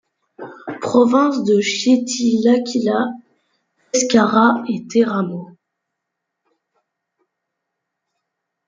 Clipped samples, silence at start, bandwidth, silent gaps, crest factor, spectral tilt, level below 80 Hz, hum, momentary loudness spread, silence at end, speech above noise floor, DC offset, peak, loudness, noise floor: under 0.1%; 0.4 s; 9.4 kHz; none; 18 dB; -4.5 dB/octave; -66 dBFS; none; 18 LU; 3.2 s; 63 dB; under 0.1%; -2 dBFS; -17 LUFS; -79 dBFS